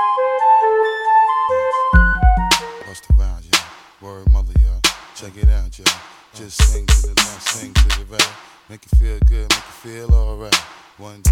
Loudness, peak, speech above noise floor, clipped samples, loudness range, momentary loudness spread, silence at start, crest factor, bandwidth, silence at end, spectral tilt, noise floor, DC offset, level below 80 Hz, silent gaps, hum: -17 LUFS; 0 dBFS; 21 dB; under 0.1%; 4 LU; 14 LU; 0 s; 16 dB; 16 kHz; 0 s; -3.5 dB/octave; -37 dBFS; under 0.1%; -18 dBFS; none; none